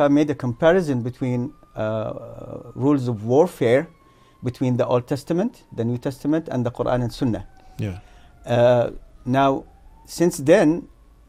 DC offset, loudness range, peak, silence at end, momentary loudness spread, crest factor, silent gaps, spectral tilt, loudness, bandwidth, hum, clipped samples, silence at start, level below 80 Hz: under 0.1%; 4 LU; -2 dBFS; 0.45 s; 15 LU; 20 dB; none; -7 dB/octave; -22 LUFS; 15.5 kHz; none; under 0.1%; 0 s; -48 dBFS